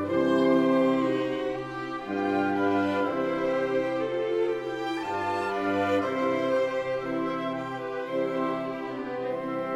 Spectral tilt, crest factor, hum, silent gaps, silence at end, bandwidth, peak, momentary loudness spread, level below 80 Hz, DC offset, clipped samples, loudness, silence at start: -6.5 dB/octave; 16 dB; none; none; 0 s; 12 kHz; -12 dBFS; 9 LU; -62 dBFS; under 0.1%; under 0.1%; -28 LUFS; 0 s